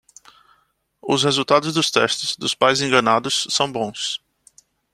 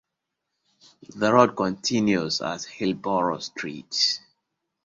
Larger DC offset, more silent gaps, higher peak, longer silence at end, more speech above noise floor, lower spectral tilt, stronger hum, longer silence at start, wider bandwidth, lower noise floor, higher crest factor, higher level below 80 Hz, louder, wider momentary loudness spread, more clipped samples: neither; neither; about the same, -2 dBFS vs -2 dBFS; about the same, 0.75 s vs 0.65 s; second, 44 dB vs 58 dB; about the same, -3 dB/octave vs -4 dB/octave; neither; about the same, 1.05 s vs 1.1 s; first, 14.5 kHz vs 7.8 kHz; second, -64 dBFS vs -83 dBFS; about the same, 20 dB vs 24 dB; about the same, -62 dBFS vs -64 dBFS; first, -19 LUFS vs -24 LUFS; second, 9 LU vs 12 LU; neither